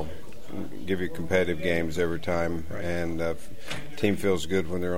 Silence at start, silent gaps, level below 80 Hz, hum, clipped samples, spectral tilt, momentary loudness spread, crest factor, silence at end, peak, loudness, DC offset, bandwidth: 0 s; none; -48 dBFS; none; under 0.1%; -6 dB/octave; 13 LU; 20 dB; 0 s; -8 dBFS; -29 LUFS; 3%; 16 kHz